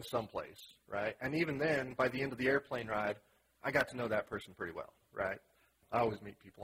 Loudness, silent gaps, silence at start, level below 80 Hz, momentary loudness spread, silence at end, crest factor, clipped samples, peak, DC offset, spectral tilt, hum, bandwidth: -37 LUFS; none; 0 s; -68 dBFS; 14 LU; 0 s; 22 dB; under 0.1%; -16 dBFS; under 0.1%; -6 dB/octave; none; 16 kHz